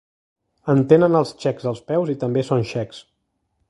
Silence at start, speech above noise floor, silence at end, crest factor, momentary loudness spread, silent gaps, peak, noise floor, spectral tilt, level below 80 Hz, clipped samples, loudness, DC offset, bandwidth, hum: 0.65 s; 53 dB; 0.7 s; 20 dB; 13 LU; none; 0 dBFS; -72 dBFS; -8 dB/octave; -58 dBFS; under 0.1%; -20 LUFS; under 0.1%; 11 kHz; none